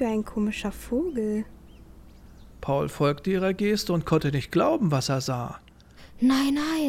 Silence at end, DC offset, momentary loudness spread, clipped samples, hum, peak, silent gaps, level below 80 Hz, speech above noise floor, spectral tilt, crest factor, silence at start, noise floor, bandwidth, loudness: 0 s; under 0.1%; 9 LU; under 0.1%; none; -10 dBFS; none; -48 dBFS; 25 dB; -6 dB/octave; 16 dB; 0 s; -50 dBFS; 16.5 kHz; -26 LUFS